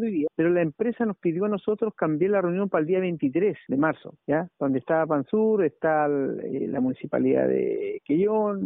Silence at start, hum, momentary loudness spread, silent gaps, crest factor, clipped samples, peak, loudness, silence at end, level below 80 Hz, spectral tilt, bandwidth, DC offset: 0 s; none; 5 LU; none; 14 dB; under 0.1%; -10 dBFS; -25 LUFS; 0 s; -66 dBFS; -4.5 dB/octave; 3.9 kHz; under 0.1%